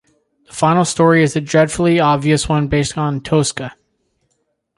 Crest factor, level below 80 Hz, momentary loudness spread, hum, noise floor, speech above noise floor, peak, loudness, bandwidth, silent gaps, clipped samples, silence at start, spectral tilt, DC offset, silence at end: 14 dB; -40 dBFS; 8 LU; none; -68 dBFS; 53 dB; -2 dBFS; -15 LUFS; 11.5 kHz; none; under 0.1%; 0.55 s; -5.5 dB/octave; under 0.1%; 1.05 s